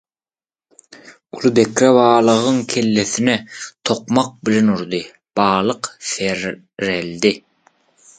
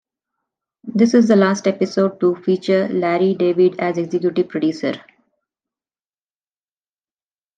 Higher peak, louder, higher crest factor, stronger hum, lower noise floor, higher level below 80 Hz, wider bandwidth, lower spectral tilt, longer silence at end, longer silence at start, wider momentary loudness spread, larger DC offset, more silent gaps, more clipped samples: about the same, 0 dBFS vs -2 dBFS; about the same, -17 LUFS vs -17 LUFS; about the same, 18 dB vs 16 dB; neither; about the same, under -90 dBFS vs under -90 dBFS; first, -56 dBFS vs -68 dBFS; about the same, 9.4 kHz vs 9 kHz; second, -4.5 dB/octave vs -6.5 dB/octave; second, 0.8 s vs 2.6 s; first, 1.05 s vs 0.85 s; first, 13 LU vs 10 LU; neither; neither; neither